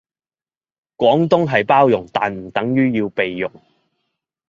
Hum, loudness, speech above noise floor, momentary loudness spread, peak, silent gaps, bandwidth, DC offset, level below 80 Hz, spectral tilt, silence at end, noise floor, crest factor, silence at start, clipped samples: none; -17 LUFS; over 74 dB; 8 LU; -2 dBFS; none; 7.4 kHz; under 0.1%; -56 dBFS; -7.5 dB/octave; 1 s; under -90 dBFS; 18 dB; 1 s; under 0.1%